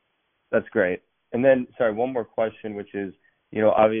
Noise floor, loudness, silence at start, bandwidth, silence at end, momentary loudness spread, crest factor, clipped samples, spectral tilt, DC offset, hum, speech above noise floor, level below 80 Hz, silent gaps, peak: -72 dBFS; -24 LUFS; 0.5 s; 3.6 kHz; 0 s; 14 LU; 18 dB; under 0.1%; -5 dB/octave; under 0.1%; none; 50 dB; -62 dBFS; none; -4 dBFS